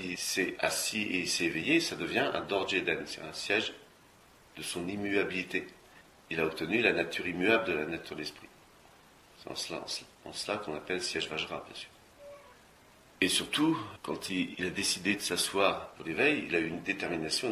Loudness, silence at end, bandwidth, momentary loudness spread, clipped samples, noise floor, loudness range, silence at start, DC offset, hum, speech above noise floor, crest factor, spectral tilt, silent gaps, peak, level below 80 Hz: -31 LUFS; 0 s; 16 kHz; 12 LU; under 0.1%; -60 dBFS; 7 LU; 0 s; under 0.1%; none; 27 dB; 22 dB; -3 dB/octave; none; -10 dBFS; -64 dBFS